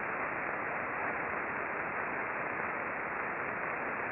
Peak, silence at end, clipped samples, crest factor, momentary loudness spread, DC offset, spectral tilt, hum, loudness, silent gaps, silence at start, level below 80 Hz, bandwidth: -20 dBFS; 0 s; under 0.1%; 16 dB; 1 LU; under 0.1%; -4.5 dB/octave; none; -35 LUFS; none; 0 s; -68 dBFS; 5.2 kHz